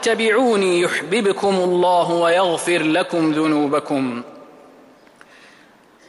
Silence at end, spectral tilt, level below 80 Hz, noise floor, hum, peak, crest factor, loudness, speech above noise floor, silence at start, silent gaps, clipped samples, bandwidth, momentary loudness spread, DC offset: 1.65 s; -4.5 dB/octave; -66 dBFS; -50 dBFS; none; -6 dBFS; 12 dB; -18 LUFS; 32 dB; 0 s; none; under 0.1%; 12 kHz; 6 LU; under 0.1%